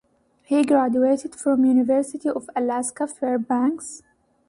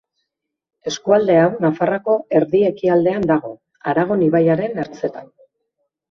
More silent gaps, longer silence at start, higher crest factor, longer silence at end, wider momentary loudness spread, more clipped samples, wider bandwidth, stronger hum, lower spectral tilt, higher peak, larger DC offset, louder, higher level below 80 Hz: neither; second, 0.5 s vs 0.85 s; about the same, 14 dB vs 18 dB; second, 0.5 s vs 0.85 s; second, 9 LU vs 12 LU; neither; first, 11.5 kHz vs 7.2 kHz; neither; second, -5 dB/octave vs -7 dB/octave; second, -8 dBFS vs 0 dBFS; neither; second, -22 LUFS vs -17 LUFS; second, -66 dBFS vs -58 dBFS